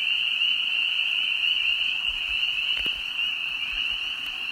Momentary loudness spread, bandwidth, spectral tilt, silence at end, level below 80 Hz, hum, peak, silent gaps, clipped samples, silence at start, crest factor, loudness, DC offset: 5 LU; 16 kHz; 0.5 dB/octave; 0 s; -54 dBFS; none; -12 dBFS; none; under 0.1%; 0 s; 14 dB; -23 LUFS; under 0.1%